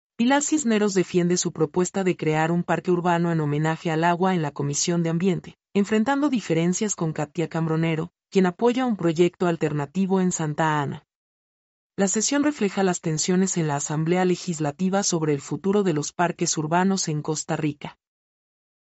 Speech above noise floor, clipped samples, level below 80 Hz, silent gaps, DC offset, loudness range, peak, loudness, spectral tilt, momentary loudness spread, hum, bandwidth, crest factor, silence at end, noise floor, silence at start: over 67 dB; under 0.1%; -64 dBFS; 11.15-11.90 s; under 0.1%; 2 LU; -8 dBFS; -23 LUFS; -5 dB/octave; 5 LU; none; 8.2 kHz; 16 dB; 0.9 s; under -90 dBFS; 0.2 s